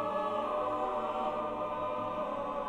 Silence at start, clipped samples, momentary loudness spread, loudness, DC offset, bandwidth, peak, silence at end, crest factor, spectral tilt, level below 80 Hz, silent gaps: 0 s; under 0.1%; 3 LU; -34 LUFS; under 0.1%; 11 kHz; -20 dBFS; 0 s; 14 dB; -6.5 dB/octave; -60 dBFS; none